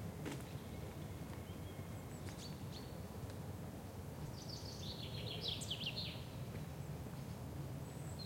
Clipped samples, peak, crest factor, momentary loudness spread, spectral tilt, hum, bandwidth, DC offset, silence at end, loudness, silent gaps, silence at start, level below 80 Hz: under 0.1%; -30 dBFS; 18 dB; 7 LU; -5 dB/octave; none; 16.5 kHz; under 0.1%; 0 s; -47 LUFS; none; 0 s; -60 dBFS